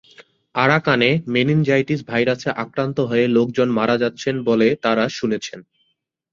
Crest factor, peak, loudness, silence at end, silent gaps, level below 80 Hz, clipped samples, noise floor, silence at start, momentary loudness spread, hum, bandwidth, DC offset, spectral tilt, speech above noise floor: 18 dB; -2 dBFS; -19 LUFS; 0.7 s; none; -58 dBFS; under 0.1%; -70 dBFS; 0.2 s; 7 LU; none; 7.4 kHz; under 0.1%; -6 dB/octave; 52 dB